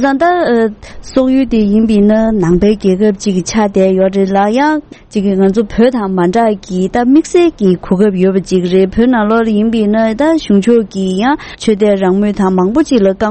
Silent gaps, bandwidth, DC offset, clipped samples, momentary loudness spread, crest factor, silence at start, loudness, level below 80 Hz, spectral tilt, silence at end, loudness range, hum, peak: none; 8.8 kHz; 0.1%; under 0.1%; 5 LU; 10 dB; 0 s; -11 LUFS; -34 dBFS; -6.5 dB/octave; 0 s; 1 LU; none; 0 dBFS